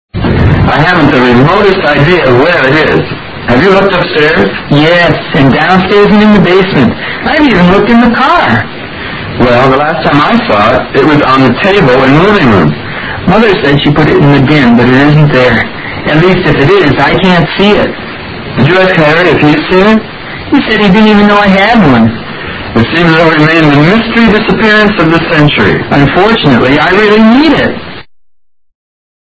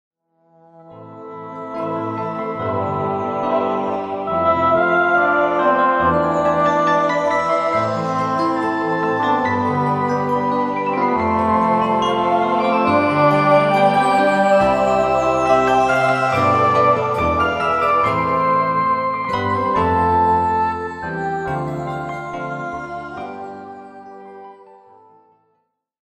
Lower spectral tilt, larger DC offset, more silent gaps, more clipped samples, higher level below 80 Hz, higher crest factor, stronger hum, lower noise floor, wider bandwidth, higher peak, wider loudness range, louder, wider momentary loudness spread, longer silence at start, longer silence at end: about the same, -7.5 dB/octave vs -6.5 dB/octave; neither; neither; first, 4% vs under 0.1%; first, -26 dBFS vs -46 dBFS; second, 6 dB vs 16 dB; neither; second, -49 dBFS vs -69 dBFS; second, 8 kHz vs 12 kHz; about the same, 0 dBFS vs -2 dBFS; second, 2 LU vs 11 LU; first, -6 LUFS vs -17 LUFS; second, 7 LU vs 12 LU; second, 0.15 s vs 0.8 s; second, 1.25 s vs 1.55 s